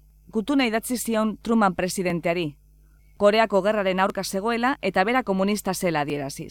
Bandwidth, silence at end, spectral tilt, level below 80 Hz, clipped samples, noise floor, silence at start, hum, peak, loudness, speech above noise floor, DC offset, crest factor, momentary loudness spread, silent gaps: 18 kHz; 0 s; -4.5 dB/octave; -52 dBFS; under 0.1%; -54 dBFS; 0.35 s; none; -6 dBFS; -23 LUFS; 31 dB; under 0.1%; 18 dB; 7 LU; none